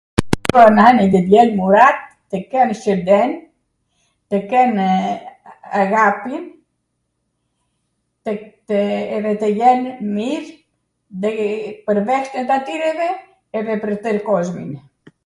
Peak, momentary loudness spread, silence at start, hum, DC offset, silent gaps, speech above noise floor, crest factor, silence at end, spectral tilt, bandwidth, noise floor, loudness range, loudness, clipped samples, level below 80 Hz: 0 dBFS; 17 LU; 0.2 s; none; under 0.1%; none; 56 dB; 18 dB; 0.45 s; -6.5 dB/octave; 12 kHz; -71 dBFS; 9 LU; -16 LUFS; under 0.1%; -46 dBFS